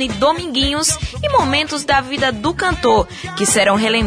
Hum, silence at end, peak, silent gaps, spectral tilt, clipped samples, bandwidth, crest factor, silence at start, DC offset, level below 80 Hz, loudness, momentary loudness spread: none; 0 s; -2 dBFS; none; -3 dB/octave; under 0.1%; 11 kHz; 14 dB; 0 s; under 0.1%; -34 dBFS; -16 LUFS; 5 LU